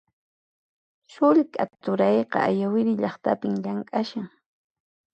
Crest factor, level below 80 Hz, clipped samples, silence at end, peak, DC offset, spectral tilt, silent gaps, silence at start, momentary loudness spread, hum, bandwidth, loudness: 18 dB; -72 dBFS; under 0.1%; 0.85 s; -8 dBFS; under 0.1%; -8 dB/octave; none; 1.2 s; 9 LU; none; 8.2 kHz; -24 LUFS